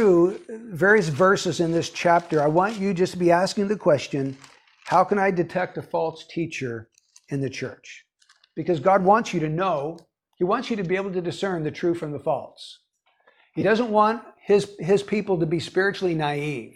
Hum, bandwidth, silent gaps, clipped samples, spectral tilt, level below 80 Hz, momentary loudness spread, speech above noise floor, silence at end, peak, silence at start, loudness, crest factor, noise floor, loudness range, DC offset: none; 12.5 kHz; none; under 0.1%; -6 dB/octave; -60 dBFS; 14 LU; 40 dB; 0.05 s; -4 dBFS; 0 s; -23 LUFS; 18 dB; -63 dBFS; 6 LU; under 0.1%